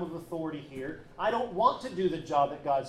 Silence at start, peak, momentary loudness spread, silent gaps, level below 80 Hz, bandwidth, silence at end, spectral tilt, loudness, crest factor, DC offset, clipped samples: 0 s; -12 dBFS; 12 LU; none; -60 dBFS; 13.5 kHz; 0 s; -6 dB/octave; -31 LUFS; 18 dB; under 0.1%; under 0.1%